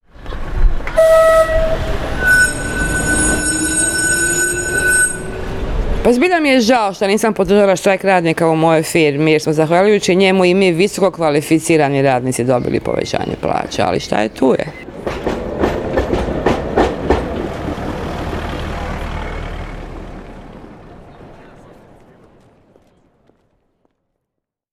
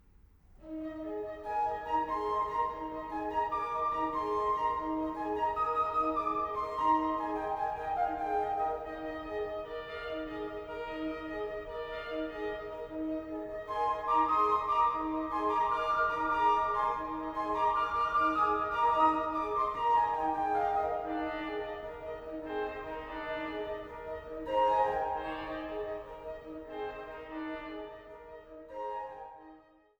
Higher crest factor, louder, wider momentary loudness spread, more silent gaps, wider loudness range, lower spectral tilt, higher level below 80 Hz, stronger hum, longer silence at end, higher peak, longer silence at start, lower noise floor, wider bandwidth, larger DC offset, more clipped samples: about the same, 14 dB vs 18 dB; first, -15 LUFS vs -33 LUFS; about the same, 13 LU vs 13 LU; neither; first, 12 LU vs 9 LU; second, -4 dB/octave vs -6 dB/octave; first, -26 dBFS vs -56 dBFS; neither; first, 3.3 s vs 0.4 s; first, -2 dBFS vs -16 dBFS; second, 0.2 s vs 0.6 s; first, -78 dBFS vs -60 dBFS; second, 16.5 kHz vs over 20 kHz; neither; neither